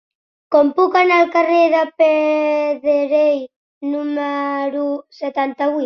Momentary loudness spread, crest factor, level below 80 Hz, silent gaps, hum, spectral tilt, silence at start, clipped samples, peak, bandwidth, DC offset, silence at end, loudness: 10 LU; 14 dB; -68 dBFS; 3.56-3.81 s; none; -4 dB/octave; 0.5 s; under 0.1%; -2 dBFS; 6.4 kHz; under 0.1%; 0 s; -16 LUFS